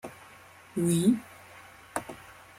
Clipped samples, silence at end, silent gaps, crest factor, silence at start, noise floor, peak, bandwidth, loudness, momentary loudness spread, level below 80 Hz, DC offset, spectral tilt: under 0.1%; 0.25 s; none; 20 dB; 0.05 s; -53 dBFS; -12 dBFS; 16.5 kHz; -29 LUFS; 25 LU; -66 dBFS; under 0.1%; -6 dB/octave